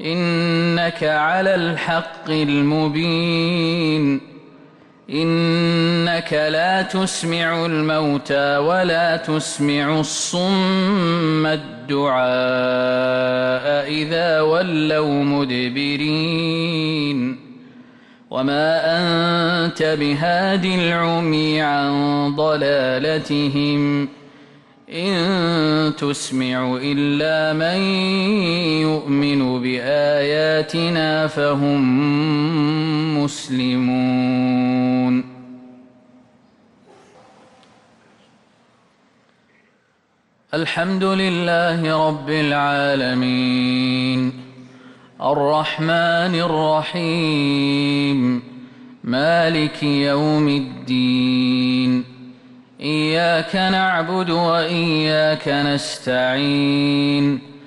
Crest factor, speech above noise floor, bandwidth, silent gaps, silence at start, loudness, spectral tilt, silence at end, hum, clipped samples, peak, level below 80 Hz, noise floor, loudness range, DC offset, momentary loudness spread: 12 dB; 43 dB; 11.5 kHz; none; 0 s; -18 LUFS; -5.5 dB/octave; 0 s; none; under 0.1%; -8 dBFS; -58 dBFS; -61 dBFS; 3 LU; under 0.1%; 4 LU